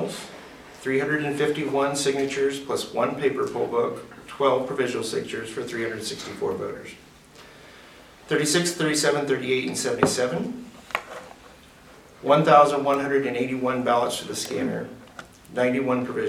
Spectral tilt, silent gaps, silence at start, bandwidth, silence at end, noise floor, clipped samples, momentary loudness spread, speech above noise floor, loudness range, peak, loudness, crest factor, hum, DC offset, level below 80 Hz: -4 dB/octave; none; 0 s; 16 kHz; 0 s; -49 dBFS; under 0.1%; 15 LU; 25 dB; 6 LU; -2 dBFS; -24 LUFS; 24 dB; none; under 0.1%; -60 dBFS